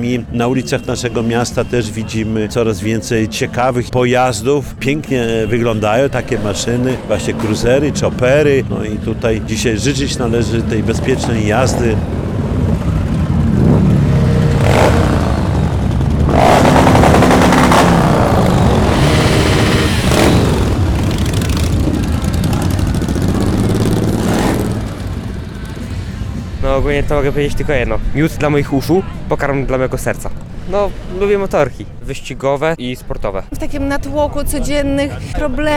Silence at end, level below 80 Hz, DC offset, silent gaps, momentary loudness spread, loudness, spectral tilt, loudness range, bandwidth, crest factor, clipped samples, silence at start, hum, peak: 0 s; -24 dBFS; under 0.1%; none; 10 LU; -14 LUFS; -6 dB/octave; 8 LU; 19 kHz; 12 dB; under 0.1%; 0 s; none; 0 dBFS